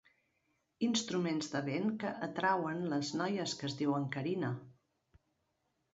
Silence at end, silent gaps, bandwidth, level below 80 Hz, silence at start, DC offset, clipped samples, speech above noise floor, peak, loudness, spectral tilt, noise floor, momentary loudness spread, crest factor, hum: 1.2 s; none; 7.6 kHz; -76 dBFS; 0.8 s; under 0.1%; under 0.1%; 46 dB; -18 dBFS; -36 LUFS; -4.5 dB/octave; -81 dBFS; 5 LU; 20 dB; none